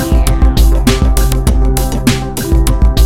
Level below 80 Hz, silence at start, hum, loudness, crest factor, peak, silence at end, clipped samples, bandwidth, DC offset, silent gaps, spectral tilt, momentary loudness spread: -10 dBFS; 0 s; none; -12 LUFS; 10 dB; 0 dBFS; 0 s; under 0.1%; 16.5 kHz; under 0.1%; none; -5.5 dB/octave; 3 LU